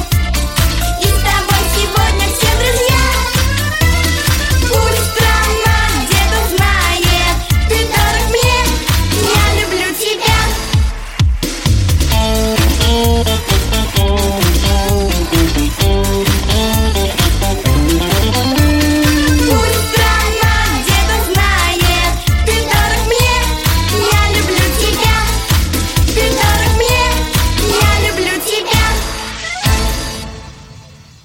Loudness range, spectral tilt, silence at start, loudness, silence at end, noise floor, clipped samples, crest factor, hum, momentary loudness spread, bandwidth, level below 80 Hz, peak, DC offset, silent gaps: 2 LU; -4 dB/octave; 0 s; -13 LUFS; 0.3 s; -37 dBFS; under 0.1%; 12 dB; none; 3 LU; 17 kHz; -18 dBFS; 0 dBFS; under 0.1%; none